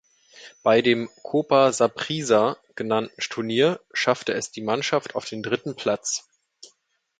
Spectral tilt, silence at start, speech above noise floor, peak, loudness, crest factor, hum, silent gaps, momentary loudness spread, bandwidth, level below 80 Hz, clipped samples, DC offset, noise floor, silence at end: -4 dB/octave; 0.35 s; 46 dB; -4 dBFS; -23 LUFS; 20 dB; none; none; 9 LU; 9.6 kHz; -68 dBFS; under 0.1%; under 0.1%; -68 dBFS; 1 s